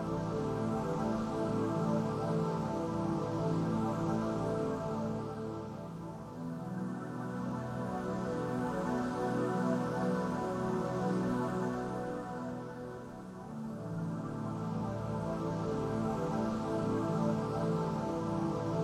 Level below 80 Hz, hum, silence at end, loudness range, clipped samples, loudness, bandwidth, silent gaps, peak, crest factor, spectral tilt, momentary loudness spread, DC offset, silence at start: -58 dBFS; none; 0 s; 5 LU; under 0.1%; -36 LUFS; 13 kHz; none; -20 dBFS; 14 dB; -7.5 dB/octave; 9 LU; under 0.1%; 0 s